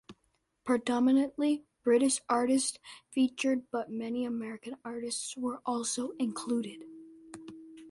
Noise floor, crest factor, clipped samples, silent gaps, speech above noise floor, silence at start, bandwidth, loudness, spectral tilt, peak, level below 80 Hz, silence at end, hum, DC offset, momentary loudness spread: -76 dBFS; 16 dB; under 0.1%; none; 45 dB; 0.1 s; 11.5 kHz; -31 LUFS; -3 dB/octave; -16 dBFS; -74 dBFS; 0 s; none; under 0.1%; 21 LU